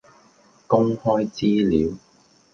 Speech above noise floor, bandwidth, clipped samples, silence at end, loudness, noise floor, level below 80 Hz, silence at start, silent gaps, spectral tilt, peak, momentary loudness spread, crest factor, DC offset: 36 dB; 7.2 kHz; under 0.1%; 0.55 s; -21 LUFS; -55 dBFS; -48 dBFS; 0.7 s; none; -7.5 dB/octave; -4 dBFS; 6 LU; 20 dB; under 0.1%